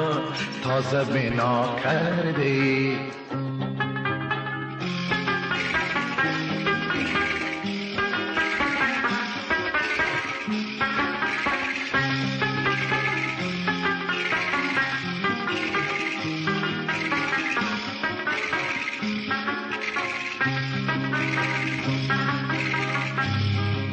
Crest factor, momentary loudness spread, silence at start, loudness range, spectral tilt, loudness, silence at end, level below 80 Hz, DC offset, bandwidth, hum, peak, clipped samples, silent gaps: 14 dB; 5 LU; 0 s; 2 LU; -5.5 dB/octave; -25 LUFS; 0 s; -54 dBFS; under 0.1%; 8.8 kHz; none; -12 dBFS; under 0.1%; none